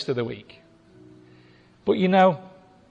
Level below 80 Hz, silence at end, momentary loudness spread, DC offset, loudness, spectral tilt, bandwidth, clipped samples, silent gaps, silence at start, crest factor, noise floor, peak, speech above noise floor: -64 dBFS; 0.45 s; 16 LU; under 0.1%; -22 LUFS; -7.5 dB/octave; 7.6 kHz; under 0.1%; none; 0 s; 18 dB; -54 dBFS; -6 dBFS; 32 dB